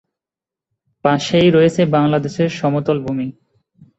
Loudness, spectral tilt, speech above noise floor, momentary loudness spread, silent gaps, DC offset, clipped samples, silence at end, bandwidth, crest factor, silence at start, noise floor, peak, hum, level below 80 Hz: -16 LUFS; -6.5 dB/octave; 73 dB; 10 LU; none; under 0.1%; under 0.1%; 0.7 s; 8.2 kHz; 16 dB; 1.05 s; -88 dBFS; -2 dBFS; none; -52 dBFS